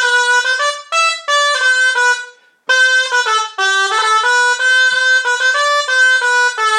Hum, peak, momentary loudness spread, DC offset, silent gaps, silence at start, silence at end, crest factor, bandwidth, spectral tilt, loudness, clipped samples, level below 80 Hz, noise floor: none; -2 dBFS; 4 LU; under 0.1%; none; 0 s; 0 s; 12 dB; 13.5 kHz; 4 dB/octave; -12 LUFS; under 0.1%; -80 dBFS; -34 dBFS